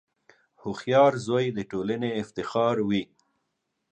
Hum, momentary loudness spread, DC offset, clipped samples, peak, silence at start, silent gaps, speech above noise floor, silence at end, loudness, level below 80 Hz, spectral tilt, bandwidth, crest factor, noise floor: none; 14 LU; under 0.1%; under 0.1%; -8 dBFS; 0.65 s; none; 54 dB; 0.85 s; -26 LUFS; -64 dBFS; -6.5 dB/octave; 9 kHz; 20 dB; -79 dBFS